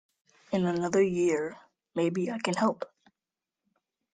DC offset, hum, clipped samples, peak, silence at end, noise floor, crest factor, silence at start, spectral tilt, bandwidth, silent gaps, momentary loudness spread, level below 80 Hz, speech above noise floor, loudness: under 0.1%; none; under 0.1%; -12 dBFS; 1.3 s; under -90 dBFS; 18 dB; 0.5 s; -6 dB/octave; 9.4 kHz; none; 12 LU; -70 dBFS; over 62 dB; -29 LUFS